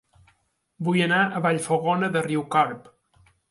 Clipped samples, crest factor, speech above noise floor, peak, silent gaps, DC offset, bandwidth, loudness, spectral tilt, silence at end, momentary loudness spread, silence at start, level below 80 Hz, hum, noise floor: under 0.1%; 18 dB; 46 dB; -6 dBFS; none; under 0.1%; 11.5 kHz; -23 LUFS; -5.5 dB/octave; 0.7 s; 6 LU; 0.8 s; -68 dBFS; none; -68 dBFS